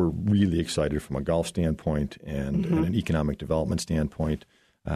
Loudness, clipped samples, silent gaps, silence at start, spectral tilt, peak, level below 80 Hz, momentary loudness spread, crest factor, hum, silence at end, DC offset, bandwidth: -27 LUFS; under 0.1%; none; 0 s; -6.5 dB/octave; -10 dBFS; -40 dBFS; 7 LU; 16 dB; none; 0 s; under 0.1%; 13.5 kHz